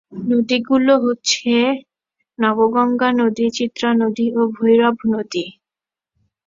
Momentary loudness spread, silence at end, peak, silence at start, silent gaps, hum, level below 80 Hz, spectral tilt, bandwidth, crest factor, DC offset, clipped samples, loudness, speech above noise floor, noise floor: 7 LU; 0.95 s; -2 dBFS; 0.1 s; none; none; -62 dBFS; -4 dB/octave; 7.6 kHz; 16 dB; under 0.1%; under 0.1%; -17 LUFS; 73 dB; -89 dBFS